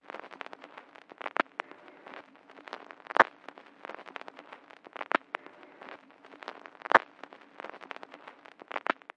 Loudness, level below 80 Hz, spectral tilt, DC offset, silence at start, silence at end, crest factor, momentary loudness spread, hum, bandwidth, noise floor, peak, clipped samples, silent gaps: -31 LUFS; under -90 dBFS; -4 dB/octave; under 0.1%; 0.15 s; 0.25 s; 32 dB; 25 LU; none; 9.8 kHz; -53 dBFS; -4 dBFS; under 0.1%; none